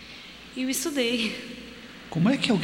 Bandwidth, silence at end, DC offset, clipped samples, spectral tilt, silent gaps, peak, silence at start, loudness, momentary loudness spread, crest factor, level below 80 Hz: 16.5 kHz; 0 s; under 0.1%; under 0.1%; -4 dB/octave; none; -4 dBFS; 0 s; -26 LUFS; 18 LU; 22 dB; -58 dBFS